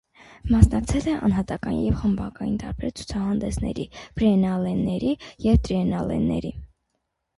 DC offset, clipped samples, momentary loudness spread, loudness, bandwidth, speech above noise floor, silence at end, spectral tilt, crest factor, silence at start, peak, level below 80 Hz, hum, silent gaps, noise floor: under 0.1%; under 0.1%; 11 LU; -24 LUFS; 11.5 kHz; 54 dB; 0.7 s; -7.5 dB/octave; 22 dB; 0.45 s; 0 dBFS; -32 dBFS; none; none; -77 dBFS